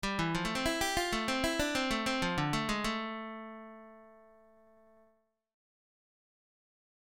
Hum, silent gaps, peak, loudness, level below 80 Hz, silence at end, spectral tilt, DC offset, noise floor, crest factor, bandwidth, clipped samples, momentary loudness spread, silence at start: none; none; -16 dBFS; -33 LUFS; -52 dBFS; 2.8 s; -3.5 dB/octave; under 0.1%; -72 dBFS; 20 dB; 17 kHz; under 0.1%; 15 LU; 0.05 s